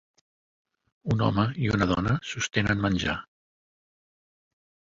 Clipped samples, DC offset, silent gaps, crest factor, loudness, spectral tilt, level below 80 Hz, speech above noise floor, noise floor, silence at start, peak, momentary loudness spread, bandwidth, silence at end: under 0.1%; under 0.1%; none; 20 dB; -26 LUFS; -5.5 dB/octave; -46 dBFS; over 65 dB; under -90 dBFS; 1.05 s; -8 dBFS; 6 LU; 7.8 kHz; 1.7 s